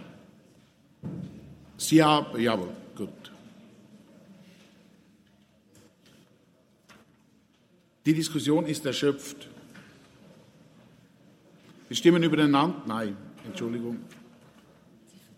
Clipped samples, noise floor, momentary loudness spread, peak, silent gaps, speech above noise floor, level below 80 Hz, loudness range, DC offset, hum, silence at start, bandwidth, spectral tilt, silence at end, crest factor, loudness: under 0.1%; -64 dBFS; 26 LU; -6 dBFS; none; 38 dB; -70 dBFS; 9 LU; under 0.1%; none; 0 s; 16 kHz; -5 dB/octave; 1.25 s; 24 dB; -26 LUFS